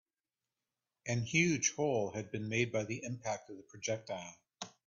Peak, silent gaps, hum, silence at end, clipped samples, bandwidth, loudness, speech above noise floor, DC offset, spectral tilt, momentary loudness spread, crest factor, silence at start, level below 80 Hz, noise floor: -16 dBFS; none; none; 0.2 s; under 0.1%; 7.6 kHz; -36 LUFS; over 54 dB; under 0.1%; -4.5 dB/octave; 17 LU; 22 dB; 1.05 s; -72 dBFS; under -90 dBFS